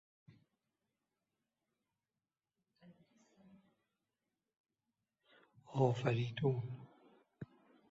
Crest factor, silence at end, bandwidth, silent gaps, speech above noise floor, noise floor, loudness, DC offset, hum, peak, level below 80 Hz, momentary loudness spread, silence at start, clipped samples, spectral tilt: 26 dB; 0.45 s; 7.6 kHz; 4.60-4.64 s; over 54 dB; under -90 dBFS; -38 LUFS; under 0.1%; none; -20 dBFS; -78 dBFS; 22 LU; 2.85 s; under 0.1%; -6.5 dB/octave